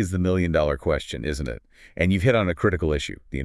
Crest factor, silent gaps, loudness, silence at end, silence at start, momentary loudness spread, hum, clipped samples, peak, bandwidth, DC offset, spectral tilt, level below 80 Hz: 18 dB; none; -24 LUFS; 0 s; 0 s; 11 LU; none; under 0.1%; -4 dBFS; 12 kHz; under 0.1%; -6.5 dB/octave; -38 dBFS